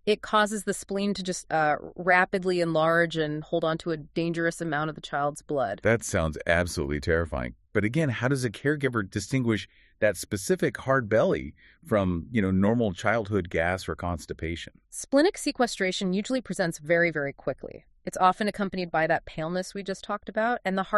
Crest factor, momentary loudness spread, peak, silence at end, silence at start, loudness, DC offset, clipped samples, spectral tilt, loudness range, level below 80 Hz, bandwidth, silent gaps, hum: 20 dB; 9 LU; -6 dBFS; 0 s; 0.05 s; -27 LUFS; under 0.1%; under 0.1%; -5 dB/octave; 2 LU; -48 dBFS; 13 kHz; none; none